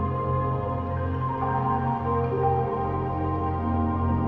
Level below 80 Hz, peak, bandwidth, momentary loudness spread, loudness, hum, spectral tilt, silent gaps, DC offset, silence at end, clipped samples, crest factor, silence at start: -44 dBFS; -12 dBFS; 4.5 kHz; 4 LU; -26 LUFS; none; -11 dB/octave; none; under 0.1%; 0 s; under 0.1%; 12 dB; 0 s